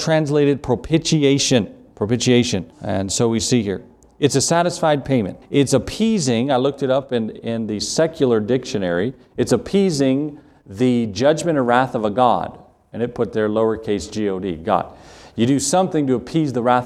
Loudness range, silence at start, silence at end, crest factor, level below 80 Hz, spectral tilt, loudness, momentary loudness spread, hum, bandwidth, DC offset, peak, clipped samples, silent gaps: 2 LU; 0 s; 0 s; 18 dB; -48 dBFS; -5 dB/octave; -19 LUFS; 9 LU; none; 14 kHz; under 0.1%; 0 dBFS; under 0.1%; none